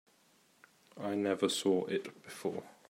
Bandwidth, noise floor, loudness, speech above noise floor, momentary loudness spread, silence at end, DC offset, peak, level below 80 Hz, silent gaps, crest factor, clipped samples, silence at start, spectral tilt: 16 kHz; -68 dBFS; -35 LUFS; 34 dB; 10 LU; 0.2 s; under 0.1%; -16 dBFS; -84 dBFS; none; 20 dB; under 0.1%; 0.95 s; -4 dB/octave